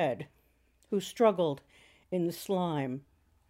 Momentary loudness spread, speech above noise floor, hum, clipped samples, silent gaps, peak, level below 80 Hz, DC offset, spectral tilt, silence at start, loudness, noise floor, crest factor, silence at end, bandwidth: 15 LU; 38 dB; none; under 0.1%; none; -12 dBFS; -72 dBFS; under 0.1%; -6 dB/octave; 0 s; -32 LUFS; -68 dBFS; 22 dB; 0.5 s; 16 kHz